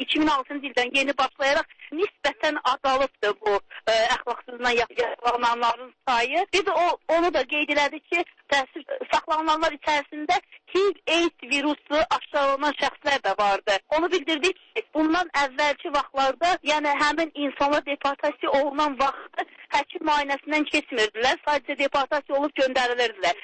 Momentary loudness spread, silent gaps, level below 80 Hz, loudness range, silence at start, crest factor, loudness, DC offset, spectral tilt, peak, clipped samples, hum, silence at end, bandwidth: 4 LU; none; -56 dBFS; 1 LU; 0 s; 12 dB; -24 LUFS; under 0.1%; -2 dB/octave; -12 dBFS; under 0.1%; none; 0 s; 8.8 kHz